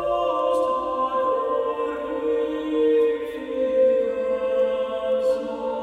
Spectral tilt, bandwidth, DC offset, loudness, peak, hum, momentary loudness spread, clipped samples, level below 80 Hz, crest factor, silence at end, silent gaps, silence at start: -5.5 dB/octave; 9.8 kHz; under 0.1%; -23 LUFS; -10 dBFS; none; 7 LU; under 0.1%; -56 dBFS; 12 dB; 0 s; none; 0 s